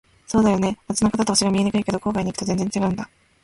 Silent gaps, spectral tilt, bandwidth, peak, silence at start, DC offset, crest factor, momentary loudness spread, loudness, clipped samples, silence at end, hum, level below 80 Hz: none; -5 dB/octave; 11.5 kHz; -6 dBFS; 0.3 s; under 0.1%; 16 dB; 6 LU; -21 LUFS; under 0.1%; 0.4 s; none; -46 dBFS